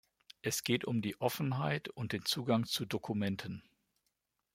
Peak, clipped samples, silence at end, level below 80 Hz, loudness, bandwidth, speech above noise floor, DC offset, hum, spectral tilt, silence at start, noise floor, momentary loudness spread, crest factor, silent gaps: -16 dBFS; under 0.1%; 0.95 s; -72 dBFS; -36 LUFS; 16.5 kHz; 48 dB; under 0.1%; none; -4.5 dB/octave; 0.45 s; -84 dBFS; 8 LU; 20 dB; none